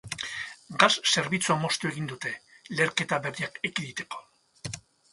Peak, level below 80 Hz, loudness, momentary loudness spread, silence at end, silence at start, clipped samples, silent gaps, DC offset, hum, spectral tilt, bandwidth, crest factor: -2 dBFS; -66 dBFS; -27 LUFS; 17 LU; 0.3 s; 0.05 s; under 0.1%; none; under 0.1%; none; -3 dB/octave; 11.5 kHz; 28 dB